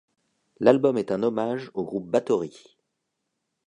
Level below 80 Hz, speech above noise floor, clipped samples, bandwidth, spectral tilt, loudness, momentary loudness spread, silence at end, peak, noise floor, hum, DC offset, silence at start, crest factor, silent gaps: -70 dBFS; 56 dB; under 0.1%; 10 kHz; -7 dB/octave; -24 LUFS; 11 LU; 1.15 s; -4 dBFS; -80 dBFS; none; under 0.1%; 0.6 s; 22 dB; none